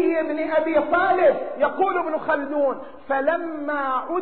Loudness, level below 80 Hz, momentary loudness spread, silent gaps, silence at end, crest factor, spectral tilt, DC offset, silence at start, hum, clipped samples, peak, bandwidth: -22 LUFS; -60 dBFS; 7 LU; none; 0 s; 14 dB; -2.5 dB/octave; 0.7%; 0 s; none; under 0.1%; -8 dBFS; 4.5 kHz